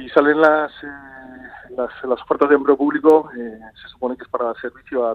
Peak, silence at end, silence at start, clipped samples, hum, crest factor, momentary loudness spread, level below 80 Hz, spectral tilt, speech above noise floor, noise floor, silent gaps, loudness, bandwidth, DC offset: 0 dBFS; 0 s; 0 s; under 0.1%; none; 18 dB; 23 LU; -56 dBFS; -6.5 dB/octave; 20 dB; -39 dBFS; none; -18 LUFS; 5.4 kHz; under 0.1%